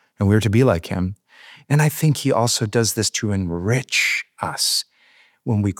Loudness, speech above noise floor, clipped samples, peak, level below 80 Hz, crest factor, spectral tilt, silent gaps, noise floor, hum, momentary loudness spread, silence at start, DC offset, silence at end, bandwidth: -19 LUFS; 36 dB; under 0.1%; -2 dBFS; -54 dBFS; 18 dB; -4.5 dB/octave; none; -55 dBFS; none; 9 LU; 0.2 s; under 0.1%; 0.05 s; 19 kHz